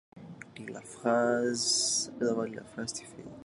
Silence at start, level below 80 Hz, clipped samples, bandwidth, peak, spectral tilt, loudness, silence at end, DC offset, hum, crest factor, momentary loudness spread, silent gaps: 0.15 s; -70 dBFS; under 0.1%; 11.5 kHz; -14 dBFS; -2.5 dB/octave; -30 LUFS; 0 s; under 0.1%; none; 18 dB; 21 LU; none